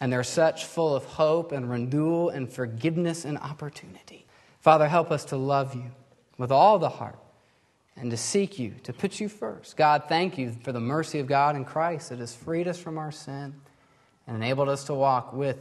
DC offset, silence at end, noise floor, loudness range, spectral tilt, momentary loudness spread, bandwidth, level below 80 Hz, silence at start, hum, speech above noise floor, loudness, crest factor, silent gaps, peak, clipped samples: under 0.1%; 0 s; -65 dBFS; 6 LU; -5.5 dB/octave; 17 LU; 12.5 kHz; -68 dBFS; 0 s; none; 39 dB; -26 LUFS; 22 dB; none; -4 dBFS; under 0.1%